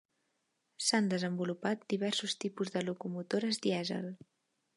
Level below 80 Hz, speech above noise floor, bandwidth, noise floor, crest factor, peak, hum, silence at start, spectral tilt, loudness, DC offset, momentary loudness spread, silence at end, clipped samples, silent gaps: -82 dBFS; 46 dB; 11.5 kHz; -81 dBFS; 20 dB; -16 dBFS; none; 0.8 s; -4 dB/octave; -34 LUFS; under 0.1%; 8 LU; 0.6 s; under 0.1%; none